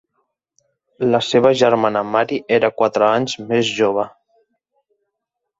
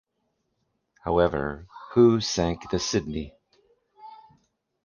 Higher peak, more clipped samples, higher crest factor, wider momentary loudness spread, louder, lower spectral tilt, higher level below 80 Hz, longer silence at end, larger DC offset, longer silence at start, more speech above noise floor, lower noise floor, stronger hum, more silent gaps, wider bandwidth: first, -2 dBFS vs -6 dBFS; neither; about the same, 18 dB vs 20 dB; second, 6 LU vs 17 LU; first, -17 LUFS vs -25 LUFS; about the same, -5 dB/octave vs -5 dB/octave; second, -60 dBFS vs -46 dBFS; first, 1.5 s vs 0.7 s; neither; about the same, 1 s vs 1.05 s; first, 63 dB vs 52 dB; about the same, -79 dBFS vs -76 dBFS; neither; neither; first, 8 kHz vs 7.2 kHz